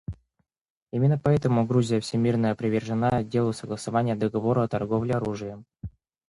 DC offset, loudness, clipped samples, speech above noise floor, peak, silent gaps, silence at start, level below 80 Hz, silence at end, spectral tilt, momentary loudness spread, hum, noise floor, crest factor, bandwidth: under 0.1%; -25 LUFS; under 0.1%; 50 dB; -10 dBFS; 0.61-0.86 s; 0.1 s; -52 dBFS; 0.4 s; -7.5 dB/octave; 15 LU; none; -75 dBFS; 16 dB; 11.5 kHz